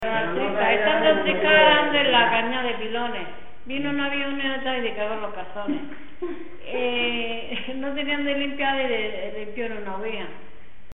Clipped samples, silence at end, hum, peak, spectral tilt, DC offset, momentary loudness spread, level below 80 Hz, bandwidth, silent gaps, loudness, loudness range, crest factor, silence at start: under 0.1%; 0.45 s; none; -4 dBFS; -7 dB/octave; 3%; 15 LU; -52 dBFS; 4.1 kHz; none; -23 LUFS; 9 LU; 20 dB; 0 s